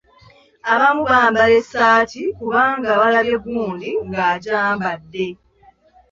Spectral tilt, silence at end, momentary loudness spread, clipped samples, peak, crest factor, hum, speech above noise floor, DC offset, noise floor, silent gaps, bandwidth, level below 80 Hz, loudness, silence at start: -5 dB/octave; 0.75 s; 11 LU; under 0.1%; -2 dBFS; 16 dB; none; 36 dB; under 0.1%; -52 dBFS; none; 7.6 kHz; -52 dBFS; -17 LUFS; 0.65 s